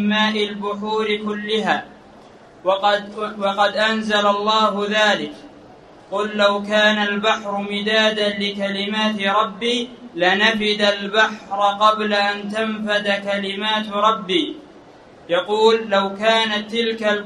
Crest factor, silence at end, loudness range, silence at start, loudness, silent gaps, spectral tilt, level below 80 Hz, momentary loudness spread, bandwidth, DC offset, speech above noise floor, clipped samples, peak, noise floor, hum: 18 dB; 0 s; 3 LU; 0 s; -19 LUFS; none; -4 dB/octave; -60 dBFS; 7 LU; 10.5 kHz; under 0.1%; 25 dB; under 0.1%; -2 dBFS; -44 dBFS; none